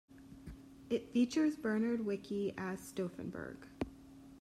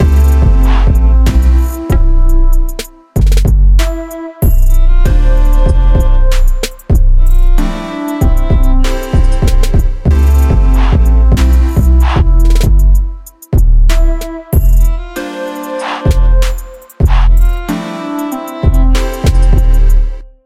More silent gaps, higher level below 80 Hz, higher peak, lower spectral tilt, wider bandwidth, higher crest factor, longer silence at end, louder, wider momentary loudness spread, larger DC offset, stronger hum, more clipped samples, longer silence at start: neither; second, -64 dBFS vs -8 dBFS; second, -22 dBFS vs 0 dBFS; about the same, -6 dB/octave vs -6.5 dB/octave; about the same, 14 kHz vs 14.5 kHz; first, 16 dB vs 8 dB; second, 0 s vs 0.2 s; second, -38 LUFS vs -12 LUFS; first, 20 LU vs 10 LU; neither; neither; neither; about the same, 0.1 s vs 0 s